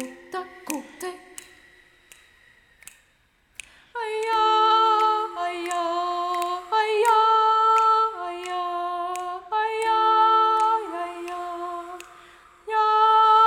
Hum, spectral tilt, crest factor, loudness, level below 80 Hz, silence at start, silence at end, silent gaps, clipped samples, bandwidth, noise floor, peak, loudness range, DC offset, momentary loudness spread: none; -1 dB/octave; 16 dB; -22 LUFS; -66 dBFS; 0 s; 0 s; none; under 0.1%; 16.5 kHz; -63 dBFS; -8 dBFS; 17 LU; under 0.1%; 19 LU